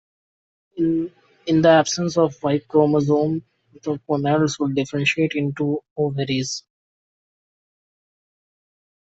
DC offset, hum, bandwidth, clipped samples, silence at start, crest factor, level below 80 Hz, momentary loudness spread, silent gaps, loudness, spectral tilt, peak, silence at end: under 0.1%; none; 8 kHz; under 0.1%; 0.75 s; 18 dB; -60 dBFS; 12 LU; 5.91-5.96 s; -21 LUFS; -5.5 dB/octave; -4 dBFS; 2.4 s